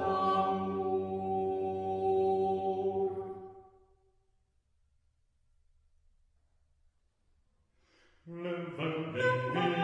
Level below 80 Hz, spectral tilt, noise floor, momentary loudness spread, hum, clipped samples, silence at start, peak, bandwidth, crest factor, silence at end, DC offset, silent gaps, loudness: -68 dBFS; -7.5 dB/octave; -73 dBFS; 12 LU; none; under 0.1%; 0 s; -18 dBFS; 8 kHz; 18 dB; 0 s; under 0.1%; none; -33 LUFS